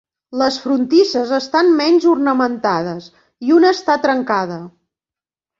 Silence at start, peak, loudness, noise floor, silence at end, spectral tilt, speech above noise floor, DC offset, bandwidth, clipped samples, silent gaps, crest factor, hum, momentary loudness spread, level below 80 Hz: 0.3 s; -2 dBFS; -15 LUFS; under -90 dBFS; 0.9 s; -5 dB/octave; over 75 dB; under 0.1%; 7.6 kHz; under 0.1%; none; 14 dB; none; 13 LU; -62 dBFS